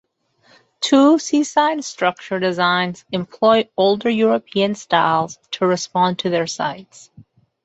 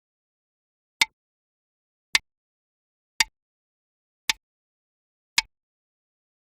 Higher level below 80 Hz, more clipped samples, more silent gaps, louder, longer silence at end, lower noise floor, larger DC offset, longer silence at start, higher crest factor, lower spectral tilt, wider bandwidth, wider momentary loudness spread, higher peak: about the same, -64 dBFS vs -64 dBFS; neither; second, none vs 1.13-2.13 s, 2.37-3.20 s, 3.42-4.28 s, 4.43-5.36 s; first, -18 LUFS vs -26 LUFS; second, 0.45 s vs 1.05 s; second, -58 dBFS vs under -90 dBFS; neither; second, 0.8 s vs 1 s; second, 16 dB vs 32 dB; first, -4.5 dB/octave vs 2.5 dB/octave; second, 8.2 kHz vs 15 kHz; first, 10 LU vs 3 LU; about the same, -2 dBFS vs -2 dBFS